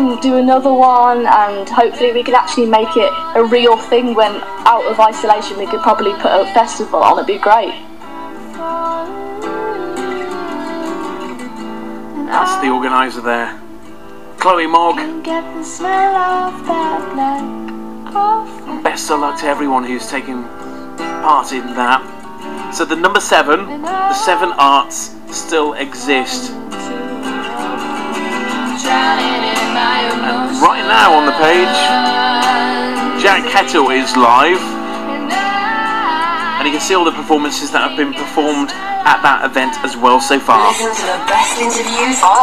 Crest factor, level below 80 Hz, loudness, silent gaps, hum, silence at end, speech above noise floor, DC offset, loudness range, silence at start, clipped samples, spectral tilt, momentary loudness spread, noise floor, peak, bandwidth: 14 dB; -52 dBFS; -13 LUFS; none; none; 0 s; 22 dB; 3%; 7 LU; 0 s; 0.1%; -2.5 dB/octave; 14 LU; -35 dBFS; 0 dBFS; 16 kHz